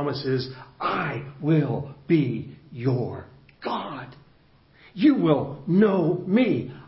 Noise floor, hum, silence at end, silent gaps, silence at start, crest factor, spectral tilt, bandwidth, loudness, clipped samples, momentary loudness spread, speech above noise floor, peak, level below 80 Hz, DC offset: -57 dBFS; none; 0 s; none; 0 s; 18 dB; -11.5 dB/octave; 5.8 kHz; -24 LUFS; under 0.1%; 16 LU; 33 dB; -6 dBFS; -58 dBFS; under 0.1%